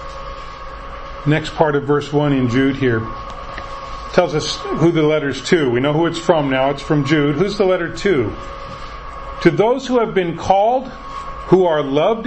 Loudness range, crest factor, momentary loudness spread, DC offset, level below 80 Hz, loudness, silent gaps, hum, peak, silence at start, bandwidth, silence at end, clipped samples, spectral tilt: 2 LU; 18 dB; 16 LU; under 0.1%; -36 dBFS; -17 LUFS; none; none; 0 dBFS; 0 s; 8.6 kHz; 0 s; under 0.1%; -6 dB/octave